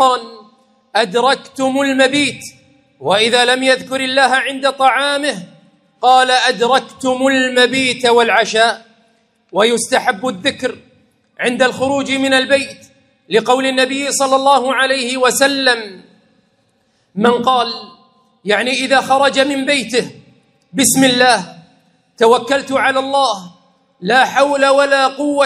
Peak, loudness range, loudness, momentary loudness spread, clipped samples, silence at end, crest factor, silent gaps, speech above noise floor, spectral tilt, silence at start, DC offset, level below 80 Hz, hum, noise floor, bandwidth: 0 dBFS; 3 LU; -13 LUFS; 9 LU; under 0.1%; 0 s; 14 dB; none; 46 dB; -2.5 dB/octave; 0 s; under 0.1%; -62 dBFS; none; -60 dBFS; 15.5 kHz